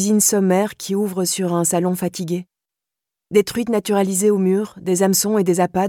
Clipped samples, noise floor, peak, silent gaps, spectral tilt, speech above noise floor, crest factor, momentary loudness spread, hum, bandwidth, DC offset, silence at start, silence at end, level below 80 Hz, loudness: under 0.1%; -86 dBFS; -4 dBFS; none; -4.5 dB/octave; 68 dB; 16 dB; 7 LU; none; 18.5 kHz; under 0.1%; 0 s; 0 s; -58 dBFS; -18 LUFS